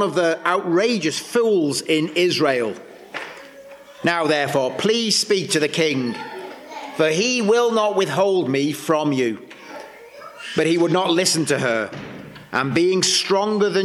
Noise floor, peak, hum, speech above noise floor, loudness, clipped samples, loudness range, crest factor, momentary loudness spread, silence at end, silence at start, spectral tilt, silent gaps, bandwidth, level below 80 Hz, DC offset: -42 dBFS; -4 dBFS; none; 23 dB; -19 LUFS; under 0.1%; 2 LU; 16 dB; 18 LU; 0 s; 0 s; -3.5 dB/octave; none; 15.5 kHz; -66 dBFS; under 0.1%